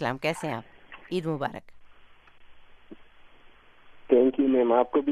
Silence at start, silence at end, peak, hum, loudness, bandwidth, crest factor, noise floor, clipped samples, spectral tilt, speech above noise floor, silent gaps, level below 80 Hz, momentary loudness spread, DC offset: 0 s; 0 s; -8 dBFS; none; -26 LUFS; 13 kHz; 20 dB; -53 dBFS; under 0.1%; -6.5 dB/octave; 28 dB; none; -60 dBFS; 20 LU; under 0.1%